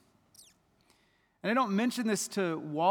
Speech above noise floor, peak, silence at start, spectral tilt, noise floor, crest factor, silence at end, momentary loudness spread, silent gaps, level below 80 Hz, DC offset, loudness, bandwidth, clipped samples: 41 dB; -14 dBFS; 1.45 s; -4.5 dB/octave; -70 dBFS; 18 dB; 0 s; 5 LU; none; -82 dBFS; under 0.1%; -31 LUFS; over 20 kHz; under 0.1%